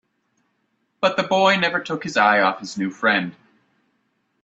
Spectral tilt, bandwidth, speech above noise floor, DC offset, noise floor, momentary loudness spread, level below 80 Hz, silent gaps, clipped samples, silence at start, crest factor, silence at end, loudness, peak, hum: -4.5 dB/octave; 8 kHz; 50 dB; under 0.1%; -70 dBFS; 10 LU; -68 dBFS; none; under 0.1%; 1 s; 22 dB; 1.1 s; -19 LUFS; 0 dBFS; none